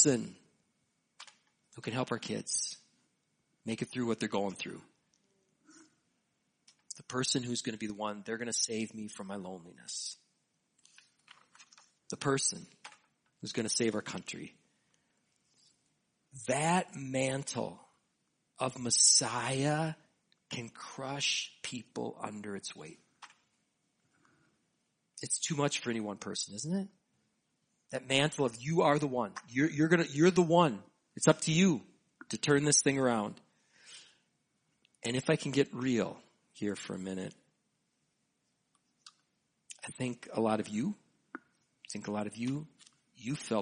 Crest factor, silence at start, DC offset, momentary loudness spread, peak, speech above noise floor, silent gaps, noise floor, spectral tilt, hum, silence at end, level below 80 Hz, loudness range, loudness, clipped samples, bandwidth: 26 dB; 0 s; under 0.1%; 20 LU; -10 dBFS; 47 dB; none; -80 dBFS; -3.5 dB/octave; none; 0 s; -74 dBFS; 12 LU; -33 LUFS; under 0.1%; 10 kHz